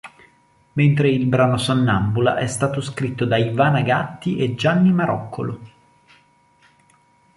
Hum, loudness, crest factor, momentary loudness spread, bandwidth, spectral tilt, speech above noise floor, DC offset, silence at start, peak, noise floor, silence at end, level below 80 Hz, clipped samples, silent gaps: none; -19 LUFS; 18 dB; 9 LU; 11.5 kHz; -6.5 dB/octave; 38 dB; under 0.1%; 0.05 s; -2 dBFS; -57 dBFS; 1.7 s; -50 dBFS; under 0.1%; none